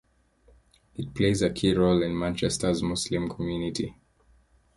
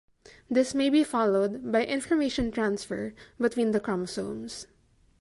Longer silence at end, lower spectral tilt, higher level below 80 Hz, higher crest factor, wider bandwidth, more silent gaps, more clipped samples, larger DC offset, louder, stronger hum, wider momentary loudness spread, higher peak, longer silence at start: first, 0.85 s vs 0.55 s; about the same, -5.5 dB/octave vs -5 dB/octave; first, -48 dBFS vs -54 dBFS; about the same, 18 dB vs 16 dB; about the same, 11.5 kHz vs 11.5 kHz; neither; neither; neither; about the same, -27 LUFS vs -28 LUFS; neither; about the same, 12 LU vs 11 LU; about the same, -10 dBFS vs -12 dBFS; first, 1 s vs 0.5 s